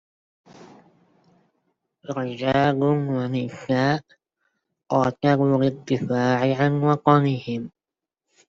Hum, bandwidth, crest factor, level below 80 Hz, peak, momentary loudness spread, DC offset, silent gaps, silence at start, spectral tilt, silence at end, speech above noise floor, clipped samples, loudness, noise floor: none; 7.4 kHz; 22 dB; -60 dBFS; -2 dBFS; 10 LU; under 0.1%; none; 0.6 s; -7.5 dB/octave; 0.8 s; 67 dB; under 0.1%; -22 LUFS; -88 dBFS